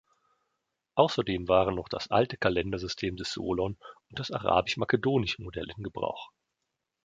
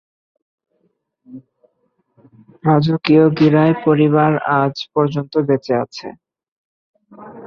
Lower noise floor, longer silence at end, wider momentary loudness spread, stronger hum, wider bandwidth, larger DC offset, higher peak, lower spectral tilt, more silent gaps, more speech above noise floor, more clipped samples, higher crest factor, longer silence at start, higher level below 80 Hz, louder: first, -84 dBFS vs -66 dBFS; first, 0.75 s vs 0 s; first, 12 LU vs 9 LU; neither; first, 9.2 kHz vs 6.8 kHz; neither; second, -6 dBFS vs -2 dBFS; second, -5.5 dB/octave vs -8.5 dB/octave; second, none vs 6.48-6.94 s; first, 55 dB vs 51 dB; neither; first, 24 dB vs 16 dB; second, 0.95 s vs 1.3 s; first, -52 dBFS vs -58 dBFS; second, -29 LUFS vs -15 LUFS